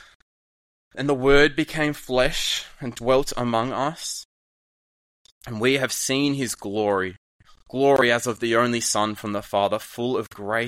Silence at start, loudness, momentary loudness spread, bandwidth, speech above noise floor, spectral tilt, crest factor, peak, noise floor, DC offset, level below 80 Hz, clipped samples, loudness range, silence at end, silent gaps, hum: 0.95 s; -22 LUFS; 12 LU; 16 kHz; over 68 dB; -3.5 dB/octave; 20 dB; -4 dBFS; under -90 dBFS; under 0.1%; -42 dBFS; under 0.1%; 4 LU; 0 s; 4.25-5.25 s, 5.31-5.41 s, 7.18-7.39 s; none